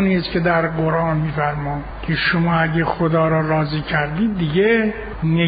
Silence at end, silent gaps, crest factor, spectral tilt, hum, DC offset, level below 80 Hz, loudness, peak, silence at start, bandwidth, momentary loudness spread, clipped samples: 0 s; none; 14 dB; -5.5 dB/octave; none; under 0.1%; -38 dBFS; -19 LUFS; -4 dBFS; 0 s; 5 kHz; 7 LU; under 0.1%